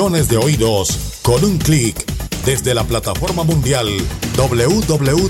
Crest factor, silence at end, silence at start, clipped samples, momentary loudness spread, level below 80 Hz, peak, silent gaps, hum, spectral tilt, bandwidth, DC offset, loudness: 14 dB; 0 s; 0 s; under 0.1%; 5 LU; -28 dBFS; -2 dBFS; none; none; -5 dB/octave; 17 kHz; under 0.1%; -16 LUFS